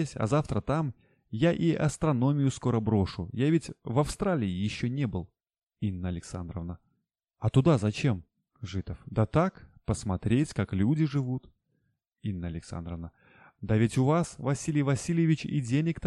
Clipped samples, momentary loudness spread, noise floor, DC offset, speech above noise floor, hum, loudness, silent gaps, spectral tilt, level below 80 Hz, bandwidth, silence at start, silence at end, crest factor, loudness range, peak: under 0.1%; 13 LU; -79 dBFS; under 0.1%; 51 dB; none; -29 LUFS; 5.63-5.67 s; -7 dB/octave; -50 dBFS; 11.5 kHz; 0 s; 0 s; 20 dB; 5 LU; -10 dBFS